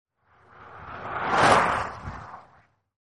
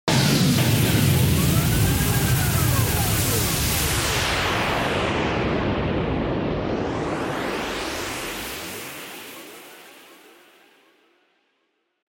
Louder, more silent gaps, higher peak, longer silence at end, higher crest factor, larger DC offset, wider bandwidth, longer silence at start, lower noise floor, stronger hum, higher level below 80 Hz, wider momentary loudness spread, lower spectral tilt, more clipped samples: about the same, -23 LUFS vs -22 LUFS; neither; about the same, -4 dBFS vs -6 dBFS; second, 0.6 s vs 1.95 s; first, 22 dB vs 16 dB; neither; second, 11 kHz vs 17 kHz; first, 0.6 s vs 0.05 s; second, -60 dBFS vs -71 dBFS; neither; second, -52 dBFS vs -36 dBFS; first, 23 LU vs 14 LU; about the same, -4 dB/octave vs -4.5 dB/octave; neither